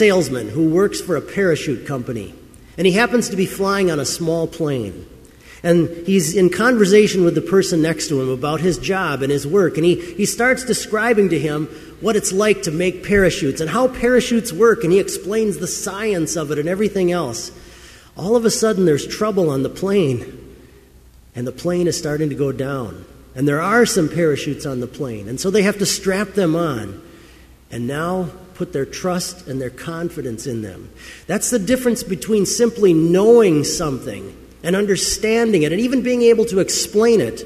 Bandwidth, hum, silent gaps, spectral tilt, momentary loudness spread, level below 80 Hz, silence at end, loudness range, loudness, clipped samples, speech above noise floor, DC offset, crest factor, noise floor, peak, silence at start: 15.5 kHz; none; none; -5 dB/octave; 13 LU; -44 dBFS; 0 s; 7 LU; -18 LUFS; under 0.1%; 29 dB; under 0.1%; 18 dB; -46 dBFS; 0 dBFS; 0 s